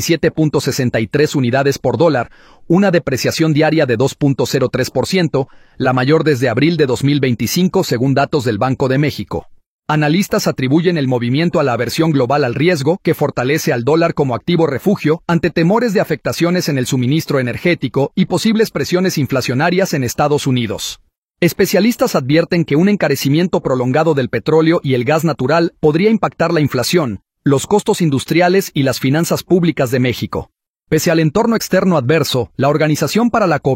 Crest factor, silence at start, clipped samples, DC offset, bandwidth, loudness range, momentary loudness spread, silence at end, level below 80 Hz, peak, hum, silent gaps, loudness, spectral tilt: 14 dB; 0 s; under 0.1%; under 0.1%; 16.5 kHz; 2 LU; 4 LU; 0 s; -46 dBFS; 0 dBFS; none; 9.66-9.79 s, 21.18-21.28 s, 30.70-30.74 s; -15 LUFS; -6 dB/octave